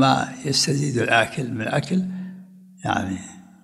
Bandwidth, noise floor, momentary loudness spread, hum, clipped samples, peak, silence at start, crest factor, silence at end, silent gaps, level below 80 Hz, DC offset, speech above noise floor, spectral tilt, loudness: 14 kHz; -44 dBFS; 14 LU; none; under 0.1%; -2 dBFS; 0 s; 22 dB; 0.2 s; none; -58 dBFS; under 0.1%; 22 dB; -4.5 dB/octave; -22 LUFS